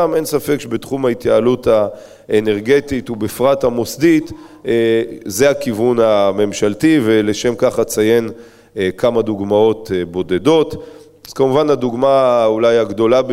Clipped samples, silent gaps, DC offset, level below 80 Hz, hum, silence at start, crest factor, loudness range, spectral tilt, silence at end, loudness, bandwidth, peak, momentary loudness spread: under 0.1%; none; under 0.1%; -46 dBFS; none; 0 s; 14 dB; 2 LU; -5.5 dB/octave; 0 s; -15 LUFS; 16 kHz; 0 dBFS; 8 LU